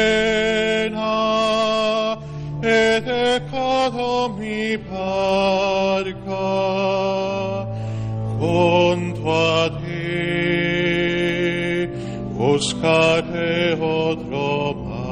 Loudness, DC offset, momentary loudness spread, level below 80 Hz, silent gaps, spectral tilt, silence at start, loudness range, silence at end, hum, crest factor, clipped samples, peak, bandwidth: -20 LUFS; under 0.1%; 9 LU; -44 dBFS; none; -5.5 dB/octave; 0 s; 2 LU; 0 s; none; 16 dB; under 0.1%; -4 dBFS; 11 kHz